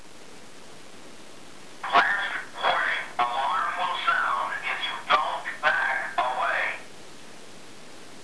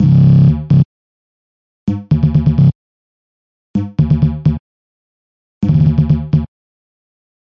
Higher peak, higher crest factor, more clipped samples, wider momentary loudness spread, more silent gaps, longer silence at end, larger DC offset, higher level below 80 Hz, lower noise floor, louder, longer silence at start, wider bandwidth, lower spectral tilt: second, -6 dBFS vs 0 dBFS; first, 22 dB vs 14 dB; neither; first, 23 LU vs 13 LU; second, none vs 0.85-1.87 s, 2.75-3.74 s, 4.60-5.61 s; second, 0 s vs 1.05 s; first, 0.8% vs under 0.1%; second, -72 dBFS vs -32 dBFS; second, -48 dBFS vs under -90 dBFS; second, -25 LUFS vs -13 LUFS; about the same, 0.05 s vs 0 s; first, 11 kHz vs 5.4 kHz; second, -1.5 dB/octave vs -11 dB/octave